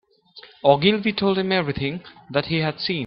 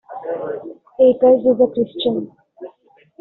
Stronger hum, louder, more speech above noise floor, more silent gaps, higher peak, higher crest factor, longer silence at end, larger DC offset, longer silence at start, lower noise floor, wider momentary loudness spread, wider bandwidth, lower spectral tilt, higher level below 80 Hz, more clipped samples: neither; second, -21 LUFS vs -17 LUFS; second, 27 dB vs 37 dB; neither; about the same, -2 dBFS vs -2 dBFS; about the same, 20 dB vs 16 dB; second, 0 s vs 0.55 s; neither; first, 0.35 s vs 0.1 s; second, -48 dBFS vs -53 dBFS; second, 10 LU vs 17 LU; first, 5.8 kHz vs 4.1 kHz; first, -9.5 dB/octave vs -5 dB/octave; first, -54 dBFS vs -60 dBFS; neither